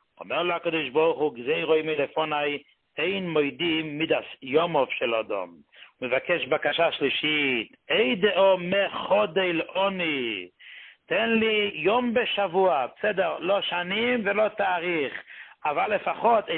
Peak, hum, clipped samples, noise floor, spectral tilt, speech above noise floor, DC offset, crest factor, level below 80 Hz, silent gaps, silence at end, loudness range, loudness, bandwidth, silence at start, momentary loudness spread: -8 dBFS; none; under 0.1%; -48 dBFS; -9 dB/octave; 23 dB; under 0.1%; 16 dB; -66 dBFS; none; 0 s; 3 LU; -25 LUFS; 4.4 kHz; 0.2 s; 9 LU